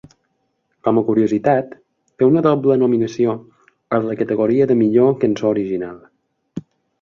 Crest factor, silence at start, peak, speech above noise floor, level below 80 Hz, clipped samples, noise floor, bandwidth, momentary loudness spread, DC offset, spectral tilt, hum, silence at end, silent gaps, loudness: 16 dB; 0.85 s; -2 dBFS; 53 dB; -58 dBFS; under 0.1%; -68 dBFS; 7.2 kHz; 17 LU; under 0.1%; -8.5 dB/octave; none; 0.4 s; none; -17 LUFS